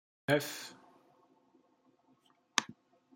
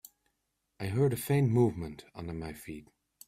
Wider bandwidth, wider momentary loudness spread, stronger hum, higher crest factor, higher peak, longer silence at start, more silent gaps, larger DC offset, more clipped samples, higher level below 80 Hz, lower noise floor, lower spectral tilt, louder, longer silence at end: about the same, 16.5 kHz vs 16 kHz; about the same, 17 LU vs 17 LU; neither; first, 34 dB vs 18 dB; first, -8 dBFS vs -16 dBFS; second, 0.3 s vs 0.8 s; neither; neither; neither; second, -84 dBFS vs -58 dBFS; second, -71 dBFS vs -81 dBFS; second, -3 dB/octave vs -7.5 dB/octave; second, -35 LUFS vs -31 LUFS; about the same, 0.45 s vs 0.45 s